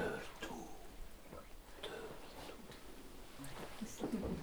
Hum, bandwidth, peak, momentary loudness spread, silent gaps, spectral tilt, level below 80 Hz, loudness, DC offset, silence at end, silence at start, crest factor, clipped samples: none; over 20 kHz; -28 dBFS; 13 LU; none; -4.5 dB/octave; -58 dBFS; -49 LUFS; under 0.1%; 0 s; 0 s; 18 dB; under 0.1%